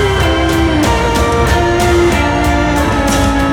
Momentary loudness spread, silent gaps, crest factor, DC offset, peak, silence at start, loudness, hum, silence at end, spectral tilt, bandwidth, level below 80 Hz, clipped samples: 2 LU; none; 10 dB; under 0.1%; -2 dBFS; 0 s; -12 LUFS; none; 0 s; -5 dB/octave; 17 kHz; -18 dBFS; under 0.1%